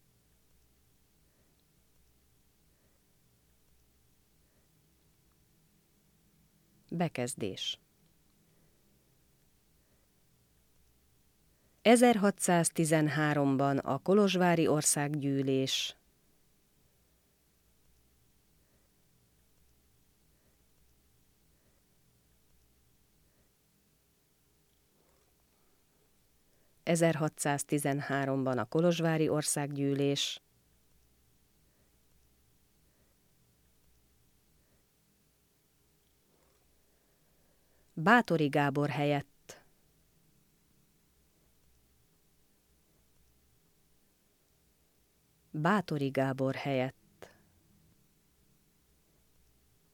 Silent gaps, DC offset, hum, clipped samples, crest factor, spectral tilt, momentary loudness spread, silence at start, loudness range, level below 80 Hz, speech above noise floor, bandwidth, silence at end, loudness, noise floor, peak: none; under 0.1%; none; under 0.1%; 26 dB; -4.5 dB/octave; 11 LU; 6.9 s; 13 LU; -74 dBFS; 42 dB; 19 kHz; 3.05 s; -30 LUFS; -71 dBFS; -10 dBFS